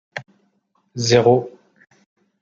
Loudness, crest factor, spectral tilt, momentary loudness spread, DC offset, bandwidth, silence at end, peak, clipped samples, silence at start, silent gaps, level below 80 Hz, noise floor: -17 LUFS; 20 dB; -5 dB/octave; 22 LU; under 0.1%; 7.6 kHz; 0.9 s; 0 dBFS; under 0.1%; 0.15 s; none; -58 dBFS; -66 dBFS